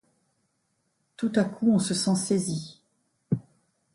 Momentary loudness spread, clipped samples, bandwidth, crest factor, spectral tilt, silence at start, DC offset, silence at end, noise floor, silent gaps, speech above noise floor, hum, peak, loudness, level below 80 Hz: 9 LU; under 0.1%; 11.5 kHz; 18 dB; -5 dB/octave; 1.2 s; under 0.1%; 0.55 s; -74 dBFS; none; 49 dB; none; -12 dBFS; -27 LUFS; -66 dBFS